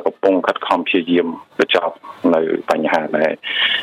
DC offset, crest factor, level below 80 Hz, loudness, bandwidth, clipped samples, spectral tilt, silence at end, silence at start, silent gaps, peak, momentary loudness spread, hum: under 0.1%; 16 dB; -68 dBFS; -17 LUFS; 12 kHz; under 0.1%; -5 dB/octave; 0 s; 0 s; none; -2 dBFS; 4 LU; none